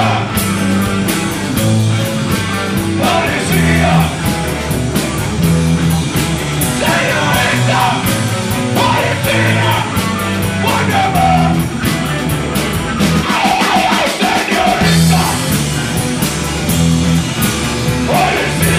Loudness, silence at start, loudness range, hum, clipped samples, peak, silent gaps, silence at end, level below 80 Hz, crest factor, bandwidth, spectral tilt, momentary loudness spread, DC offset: -13 LUFS; 0 s; 2 LU; none; under 0.1%; 0 dBFS; none; 0 s; -30 dBFS; 14 dB; 16 kHz; -4.5 dB/octave; 5 LU; under 0.1%